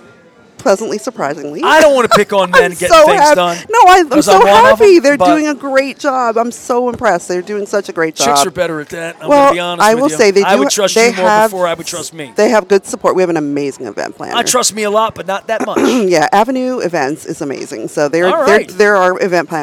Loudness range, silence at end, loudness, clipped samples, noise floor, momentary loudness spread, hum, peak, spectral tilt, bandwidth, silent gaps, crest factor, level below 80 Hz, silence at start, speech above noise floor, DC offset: 7 LU; 0 s; -11 LUFS; 0.7%; -43 dBFS; 13 LU; none; 0 dBFS; -3.5 dB/octave; over 20 kHz; none; 10 dB; -46 dBFS; 0.6 s; 32 dB; under 0.1%